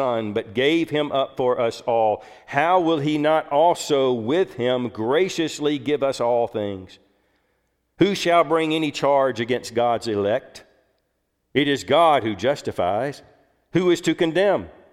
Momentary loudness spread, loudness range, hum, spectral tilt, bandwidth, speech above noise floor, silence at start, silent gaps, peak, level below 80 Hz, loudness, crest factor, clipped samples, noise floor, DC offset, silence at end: 7 LU; 3 LU; none; -5 dB/octave; 15 kHz; 51 dB; 0 s; none; -4 dBFS; -60 dBFS; -21 LUFS; 18 dB; under 0.1%; -72 dBFS; under 0.1%; 0.2 s